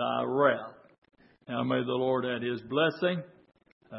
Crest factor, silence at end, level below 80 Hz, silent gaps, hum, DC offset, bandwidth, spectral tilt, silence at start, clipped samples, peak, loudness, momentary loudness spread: 22 dB; 0 s; -74 dBFS; 0.98-1.02 s, 3.72-3.81 s; none; under 0.1%; 5.8 kHz; -9.5 dB/octave; 0 s; under 0.1%; -10 dBFS; -29 LUFS; 10 LU